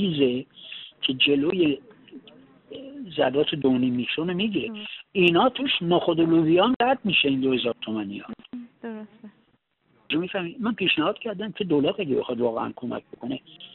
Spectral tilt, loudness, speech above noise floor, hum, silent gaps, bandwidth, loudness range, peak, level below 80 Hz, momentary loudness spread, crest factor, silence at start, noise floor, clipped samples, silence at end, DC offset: -3 dB/octave; -24 LUFS; 43 dB; none; 6.76-6.80 s; 4.3 kHz; 7 LU; -6 dBFS; -64 dBFS; 18 LU; 18 dB; 0 s; -67 dBFS; under 0.1%; 0.05 s; under 0.1%